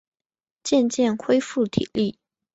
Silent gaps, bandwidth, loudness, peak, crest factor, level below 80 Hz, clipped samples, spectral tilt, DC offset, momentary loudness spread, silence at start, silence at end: none; 8.2 kHz; -23 LUFS; -4 dBFS; 18 dB; -58 dBFS; under 0.1%; -5 dB/octave; under 0.1%; 6 LU; 0.65 s; 0.45 s